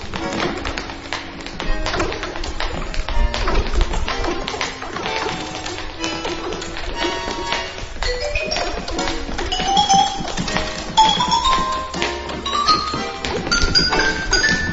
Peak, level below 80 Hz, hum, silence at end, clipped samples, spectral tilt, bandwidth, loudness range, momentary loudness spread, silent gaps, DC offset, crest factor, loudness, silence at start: 0 dBFS; -26 dBFS; none; 0 s; under 0.1%; -3 dB/octave; 8 kHz; 7 LU; 12 LU; none; 0.1%; 20 dB; -20 LUFS; 0 s